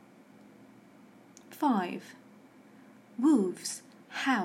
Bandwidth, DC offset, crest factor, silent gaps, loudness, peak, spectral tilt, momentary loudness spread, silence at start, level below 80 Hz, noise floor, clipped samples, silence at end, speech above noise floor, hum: 16 kHz; under 0.1%; 18 dB; none; -31 LUFS; -14 dBFS; -4.5 dB/octave; 20 LU; 1.5 s; under -90 dBFS; -56 dBFS; under 0.1%; 0 s; 28 dB; none